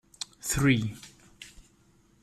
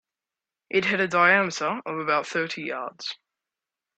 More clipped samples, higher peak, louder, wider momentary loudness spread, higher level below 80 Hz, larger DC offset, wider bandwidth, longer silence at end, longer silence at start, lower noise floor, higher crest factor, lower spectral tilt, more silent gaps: neither; second, -10 dBFS vs -6 dBFS; second, -28 LUFS vs -24 LUFS; first, 24 LU vs 15 LU; first, -48 dBFS vs -72 dBFS; neither; first, 15 kHz vs 8.8 kHz; second, 0.6 s vs 0.8 s; second, 0.2 s vs 0.7 s; second, -63 dBFS vs -89 dBFS; about the same, 22 dB vs 20 dB; about the same, -4.5 dB/octave vs -4 dB/octave; neither